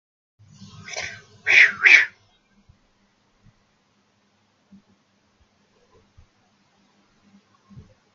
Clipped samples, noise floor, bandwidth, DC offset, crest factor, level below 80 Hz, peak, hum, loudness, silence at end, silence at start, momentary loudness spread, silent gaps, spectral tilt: under 0.1%; -65 dBFS; 7.6 kHz; under 0.1%; 26 dB; -68 dBFS; 0 dBFS; none; -15 LUFS; 6.05 s; 0.9 s; 22 LU; none; -0.5 dB/octave